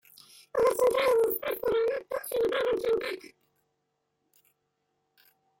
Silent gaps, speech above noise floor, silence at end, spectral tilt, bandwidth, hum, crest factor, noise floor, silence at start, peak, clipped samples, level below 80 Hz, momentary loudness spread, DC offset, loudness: none; 52 dB; 2.3 s; -3 dB/octave; 17 kHz; none; 16 dB; -79 dBFS; 0.55 s; -14 dBFS; under 0.1%; -64 dBFS; 10 LU; under 0.1%; -28 LUFS